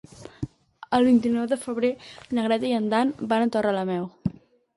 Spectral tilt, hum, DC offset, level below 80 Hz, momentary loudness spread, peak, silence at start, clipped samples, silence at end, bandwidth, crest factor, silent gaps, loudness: -6.5 dB/octave; none; under 0.1%; -56 dBFS; 17 LU; -8 dBFS; 0.2 s; under 0.1%; 0.45 s; 11.5 kHz; 18 dB; none; -24 LUFS